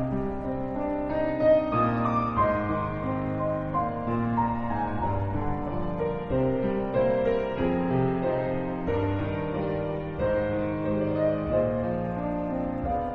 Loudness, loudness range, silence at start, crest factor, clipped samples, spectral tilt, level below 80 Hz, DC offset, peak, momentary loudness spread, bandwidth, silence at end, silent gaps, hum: -27 LUFS; 2 LU; 0 s; 16 dB; under 0.1%; -10 dB/octave; -42 dBFS; under 0.1%; -12 dBFS; 5 LU; 6.4 kHz; 0 s; none; none